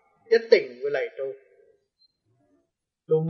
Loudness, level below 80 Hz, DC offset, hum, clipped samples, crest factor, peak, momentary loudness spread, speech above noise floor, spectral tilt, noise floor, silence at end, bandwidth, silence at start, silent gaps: -24 LUFS; -84 dBFS; under 0.1%; none; under 0.1%; 24 dB; -4 dBFS; 16 LU; 53 dB; -6.5 dB/octave; -76 dBFS; 0 s; 6 kHz; 0.3 s; none